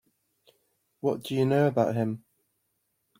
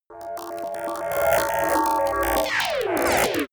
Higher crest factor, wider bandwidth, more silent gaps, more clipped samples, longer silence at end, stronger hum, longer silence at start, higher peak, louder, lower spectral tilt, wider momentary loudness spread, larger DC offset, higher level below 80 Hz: about the same, 20 dB vs 16 dB; second, 16.5 kHz vs over 20 kHz; neither; neither; first, 1 s vs 0.05 s; neither; first, 1.05 s vs 0.1 s; about the same, -10 dBFS vs -8 dBFS; second, -27 LUFS vs -23 LUFS; first, -7.5 dB/octave vs -3 dB/octave; about the same, 9 LU vs 11 LU; neither; second, -70 dBFS vs -46 dBFS